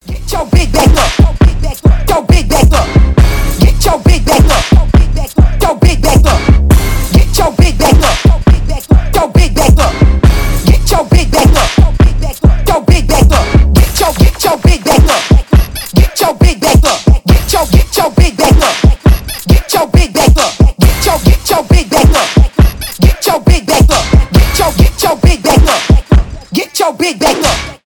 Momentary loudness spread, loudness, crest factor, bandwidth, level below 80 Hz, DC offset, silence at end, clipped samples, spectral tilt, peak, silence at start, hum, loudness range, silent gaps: 3 LU; -9 LUFS; 8 dB; 18.5 kHz; -10 dBFS; under 0.1%; 0.1 s; 3%; -5 dB/octave; 0 dBFS; 0.05 s; none; 1 LU; none